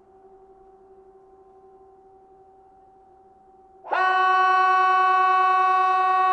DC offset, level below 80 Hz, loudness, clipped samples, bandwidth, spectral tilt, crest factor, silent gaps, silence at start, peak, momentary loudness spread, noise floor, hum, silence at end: under 0.1%; -70 dBFS; -19 LUFS; under 0.1%; 8.4 kHz; -2 dB/octave; 12 dB; none; 3.85 s; -10 dBFS; 3 LU; -53 dBFS; none; 0 s